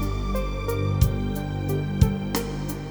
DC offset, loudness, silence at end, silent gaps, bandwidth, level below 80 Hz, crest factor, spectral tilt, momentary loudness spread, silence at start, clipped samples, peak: under 0.1%; -26 LUFS; 0 s; none; over 20 kHz; -30 dBFS; 20 dB; -6.5 dB/octave; 6 LU; 0 s; under 0.1%; -4 dBFS